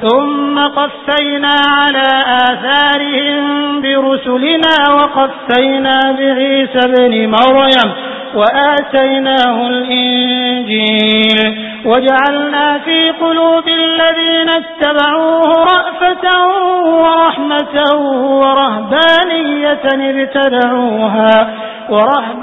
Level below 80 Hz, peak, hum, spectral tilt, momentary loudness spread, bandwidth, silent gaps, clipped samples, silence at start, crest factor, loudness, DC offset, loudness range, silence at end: -52 dBFS; 0 dBFS; none; -5.5 dB/octave; 5 LU; 8 kHz; none; 0.1%; 0 s; 10 dB; -10 LUFS; 0.1%; 1 LU; 0 s